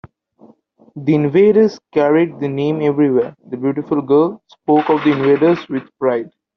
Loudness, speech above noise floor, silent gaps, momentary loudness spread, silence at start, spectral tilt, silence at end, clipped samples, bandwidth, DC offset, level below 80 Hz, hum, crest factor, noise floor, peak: -16 LUFS; 35 dB; none; 10 LU; 0.95 s; -6.5 dB/octave; 0.3 s; under 0.1%; 6.2 kHz; under 0.1%; -60 dBFS; none; 14 dB; -50 dBFS; -2 dBFS